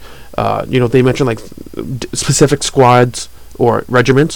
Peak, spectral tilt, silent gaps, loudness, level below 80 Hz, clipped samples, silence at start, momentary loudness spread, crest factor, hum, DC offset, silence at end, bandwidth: 0 dBFS; -5 dB/octave; none; -12 LUFS; -36 dBFS; under 0.1%; 0.05 s; 16 LU; 12 dB; none; 2%; 0 s; 18 kHz